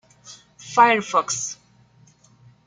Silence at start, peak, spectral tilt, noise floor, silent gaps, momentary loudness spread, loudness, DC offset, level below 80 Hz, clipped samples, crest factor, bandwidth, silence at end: 0.25 s; -2 dBFS; -2 dB/octave; -55 dBFS; none; 23 LU; -20 LUFS; under 0.1%; -70 dBFS; under 0.1%; 22 dB; 9.6 kHz; 1.15 s